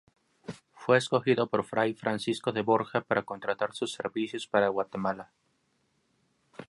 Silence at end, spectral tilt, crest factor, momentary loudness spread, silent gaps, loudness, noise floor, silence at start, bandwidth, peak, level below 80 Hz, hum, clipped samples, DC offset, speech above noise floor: 0.05 s; -5.5 dB/octave; 22 dB; 13 LU; none; -29 LUFS; -73 dBFS; 0.5 s; 11.5 kHz; -8 dBFS; -72 dBFS; none; under 0.1%; under 0.1%; 44 dB